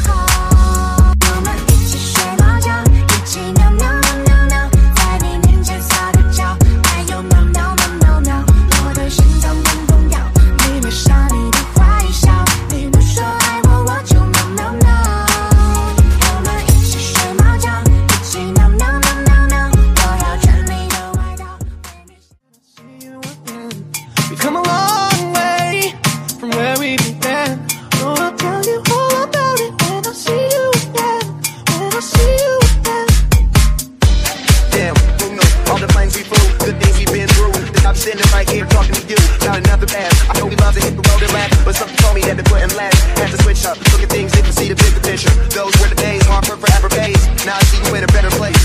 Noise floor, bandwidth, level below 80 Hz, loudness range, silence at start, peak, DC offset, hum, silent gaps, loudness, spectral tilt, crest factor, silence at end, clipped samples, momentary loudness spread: -53 dBFS; 15.5 kHz; -14 dBFS; 4 LU; 0 s; 0 dBFS; under 0.1%; none; none; -13 LUFS; -4.5 dB/octave; 12 dB; 0 s; under 0.1%; 5 LU